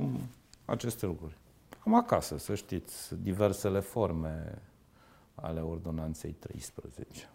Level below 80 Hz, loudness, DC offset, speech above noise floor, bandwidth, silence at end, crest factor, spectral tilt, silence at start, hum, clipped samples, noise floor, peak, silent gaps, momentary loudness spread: -52 dBFS; -34 LUFS; under 0.1%; 28 dB; 16 kHz; 0.05 s; 24 dB; -6.5 dB/octave; 0 s; none; under 0.1%; -61 dBFS; -10 dBFS; none; 19 LU